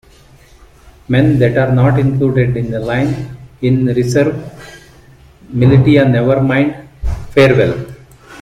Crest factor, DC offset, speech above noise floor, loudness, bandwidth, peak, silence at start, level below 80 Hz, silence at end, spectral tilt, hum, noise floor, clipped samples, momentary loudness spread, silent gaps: 14 dB; under 0.1%; 32 dB; -13 LUFS; 10 kHz; 0 dBFS; 1.1 s; -32 dBFS; 0 s; -8 dB/octave; none; -43 dBFS; under 0.1%; 14 LU; none